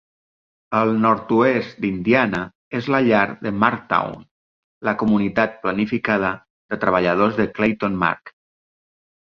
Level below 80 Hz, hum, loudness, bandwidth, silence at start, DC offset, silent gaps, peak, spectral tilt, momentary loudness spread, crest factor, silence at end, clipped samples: -54 dBFS; none; -20 LUFS; 6.6 kHz; 0.7 s; under 0.1%; 2.55-2.71 s, 4.31-4.81 s, 6.50-6.69 s; -2 dBFS; -8 dB/octave; 10 LU; 18 dB; 1 s; under 0.1%